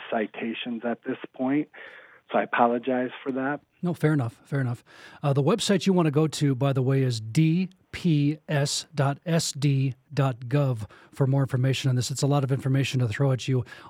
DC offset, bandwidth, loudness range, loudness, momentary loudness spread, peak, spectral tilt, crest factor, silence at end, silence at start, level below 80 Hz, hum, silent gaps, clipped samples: under 0.1%; 15 kHz; 3 LU; -26 LUFS; 8 LU; -8 dBFS; -6 dB/octave; 18 dB; 0 s; 0 s; -64 dBFS; none; none; under 0.1%